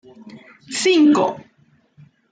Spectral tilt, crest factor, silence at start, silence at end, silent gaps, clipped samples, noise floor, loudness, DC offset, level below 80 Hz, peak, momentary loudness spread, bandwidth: -3.5 dB/octave; 14 dB; 0.3 s; 0.95 s; none; under 0.1%; -58 dBFS; -17 LUFS; under 0.1%; -72 dBFS; -6 dBFS; 16 LU; 9.4 kHz